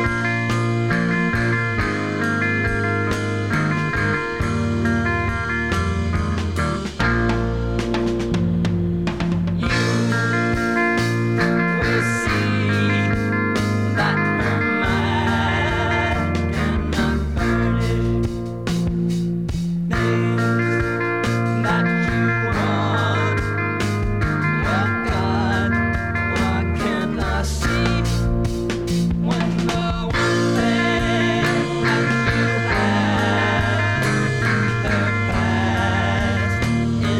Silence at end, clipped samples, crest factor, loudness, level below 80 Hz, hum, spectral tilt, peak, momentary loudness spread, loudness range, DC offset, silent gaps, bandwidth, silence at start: 0 s; under 0.1%; 14 dB; -20 LUFS; -32 dBFS; none; -6 dB/octave; -6 dBFS; 4 LU; 3 LU; 0.5%; none; 13.5 kHz; 0 s